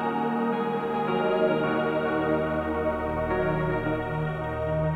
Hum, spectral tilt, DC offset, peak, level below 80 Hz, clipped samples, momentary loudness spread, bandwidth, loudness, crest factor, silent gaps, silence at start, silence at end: none; -8.5 dB/octave; under 0.1%; -12 dBFS; -44 dBFS; under 0.1%; 5 LU; 11.5 kHz; -27 LUFS; 14 dB; none; 0 s; 0 s